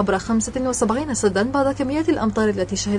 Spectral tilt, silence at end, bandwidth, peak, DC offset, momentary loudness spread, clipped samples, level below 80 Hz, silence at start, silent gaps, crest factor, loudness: -4.5 dB/octave; 0 s; 11.5 kHz; -6 dBFS; under 0.1%; 2 LU; under 0.1%; -42 dBFS; 0 s; none; 14 dB; -21 LUFS